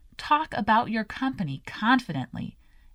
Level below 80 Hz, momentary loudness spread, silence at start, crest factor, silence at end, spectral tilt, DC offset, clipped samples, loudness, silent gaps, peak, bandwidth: -54 dBFS; 12 LU; 0.2 s; 20 dB; 0.45 s; -6 dB/octave; under 0.1%; under 0.1%; -26 LUFS; none; -8 dBFS; 11.5 kHz